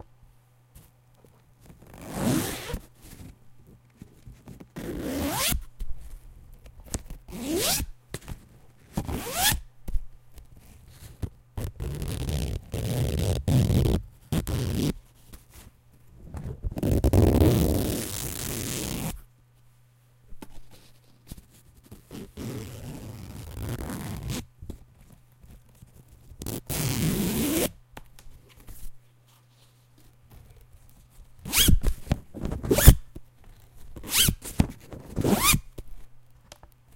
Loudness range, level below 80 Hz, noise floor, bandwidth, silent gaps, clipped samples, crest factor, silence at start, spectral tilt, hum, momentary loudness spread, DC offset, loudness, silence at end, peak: 14 LU; -34 dBFS; -59 dBFS; 17 kHz; none; under 0.1%; 28 dB; 0.75 s; -4.5 dB/octave; none; 27 LU; under 0.1%; -27 LUFS; 0.75 s; 0 dBFS